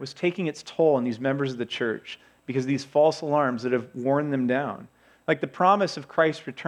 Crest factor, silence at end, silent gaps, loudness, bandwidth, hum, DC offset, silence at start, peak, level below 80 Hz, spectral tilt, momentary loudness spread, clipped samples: 18 dB; 0 s; none; -25 LUFS; 11 kHz; none; under 0.1%; 0 s; -6 dBFS; -74 dBFS; -6 dB/octave; 10 LU; under 0.1%